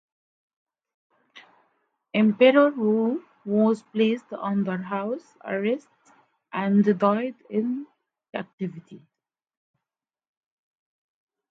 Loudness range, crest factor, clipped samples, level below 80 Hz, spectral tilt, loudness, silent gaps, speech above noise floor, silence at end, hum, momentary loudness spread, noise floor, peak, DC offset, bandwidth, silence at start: 15 LU; 22 dB; under 0.1%; -78 dBFS; -8 dB/octave; -24 LUFS; 8.53-8.58 s; over 67 dB; 2.5 s; none; 16 LU; under -90 dBFS; -6 dBFS; under 0.1%; 7.6 kHz; 1.35 s